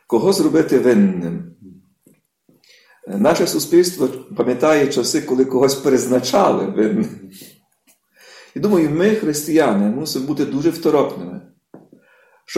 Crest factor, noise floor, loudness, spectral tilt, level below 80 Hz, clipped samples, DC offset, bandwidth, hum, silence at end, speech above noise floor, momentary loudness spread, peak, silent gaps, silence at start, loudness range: 14 dB; -59 dBFS; -17 LUFS; -5 dB/octave; -58 dBFS; under 0.1%; under 0.1%; 16 kHz; none; 0 s; 43 dB; 12 LU; -2 dBFS; none; 0.1 s; 3 LU